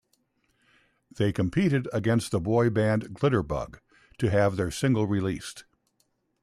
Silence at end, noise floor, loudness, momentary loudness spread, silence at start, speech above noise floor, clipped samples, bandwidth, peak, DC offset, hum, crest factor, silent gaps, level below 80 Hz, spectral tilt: 0.8 s; -73 dBFS; -26 LUFS; 9 LU; 1.2 s; 47 dB; under 0.1%; 14 kHz; -12 dBFS; under 0.1%; none; 16 dB; none; -52 dBFS; -7 dB/octave